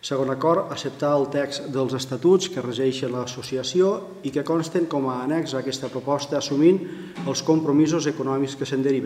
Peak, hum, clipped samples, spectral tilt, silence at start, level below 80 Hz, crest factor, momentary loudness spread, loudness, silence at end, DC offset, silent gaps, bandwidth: -6 dBFS; none; under 0.1%; -5.5 dB/octave; 0.05 s; -66 dBFS; 16 dB; 9 LU; -23 LUFS; 0 s; under 0.1%; none; 14.5 kHz